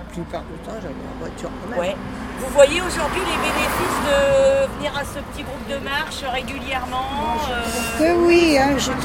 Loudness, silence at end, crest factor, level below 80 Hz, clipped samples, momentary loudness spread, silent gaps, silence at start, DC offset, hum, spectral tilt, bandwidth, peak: -20 LUFS; 0 s; 20 dB; -36 dBFS; under 0.1%; 16 LU; none; 0 s; under 0.1%; none; -4 dB/octave; 16.5 kHz; -2 dBFS